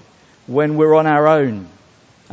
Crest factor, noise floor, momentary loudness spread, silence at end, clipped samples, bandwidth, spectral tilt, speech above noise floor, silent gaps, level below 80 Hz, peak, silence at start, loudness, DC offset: 16 dB; -50 dBFS; 10 LU; 0.65 s; under 0.1%; 7.8 kHz; -8.5 dB/octave; 36 dB; none; -58 dBFS; 0 dBFS; 0.5 s; -15 LUFS; under 0.1%